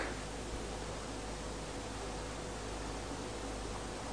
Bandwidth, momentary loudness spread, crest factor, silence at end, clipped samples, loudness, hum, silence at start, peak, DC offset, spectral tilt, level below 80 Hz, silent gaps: 11 kHz; 1 LU; 16 dB; 0 s; under 0.1%; -42 LUFS; none; 0 s; -24 dBFS; 0.1%; -4 dB/octave; -48 dBFS; none